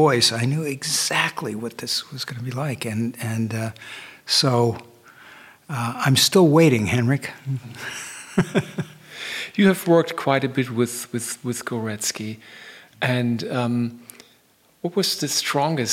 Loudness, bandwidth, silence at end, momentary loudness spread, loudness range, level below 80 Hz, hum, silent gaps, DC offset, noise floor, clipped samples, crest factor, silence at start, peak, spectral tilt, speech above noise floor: -22 LUFS; 17 kHz; 0 s; 16 LU; 6 LU; -62 dBFS; none; none; under 0.1%; -59 dBFS; under 0.1%; 20 dB; 0 s; -4 dBFS; -4.5 dB/octave; 37 dB